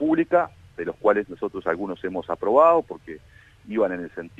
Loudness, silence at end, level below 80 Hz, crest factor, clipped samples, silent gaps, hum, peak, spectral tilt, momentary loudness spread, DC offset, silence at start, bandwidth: -23 LUFS; 0.1 s; -58 dBFS; 18 dB; under 0.1%; none; none; -4 dBFS; -8 dB/octave; 17 LU; under 0.1%; 0 s; 7.8 kHz